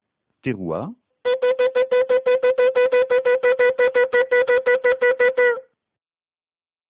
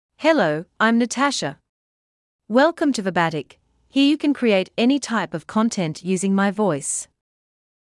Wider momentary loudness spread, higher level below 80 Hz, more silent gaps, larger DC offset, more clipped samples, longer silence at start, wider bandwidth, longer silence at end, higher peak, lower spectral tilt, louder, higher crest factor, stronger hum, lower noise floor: first, 11 LU vs 7 LU; first, -62 dBFS vs -68 dBFS; second, none vs 1.69-2.39 s; neither; neither; first, 0.45 s vs 0.2 s; second, 4 kHz vs 12 kHz; first, 1.3 s vs 0.9 s; about the same, -8 dBFS vs -6 dBFS; first, -8 dB/octave vs -4.5 dB/octave; about the same, -18 LUFS vs -20 LUFS; about the same, 12 dB vs 16 dB; neither; about the same, under -90 dBFS vs under -90 dBFS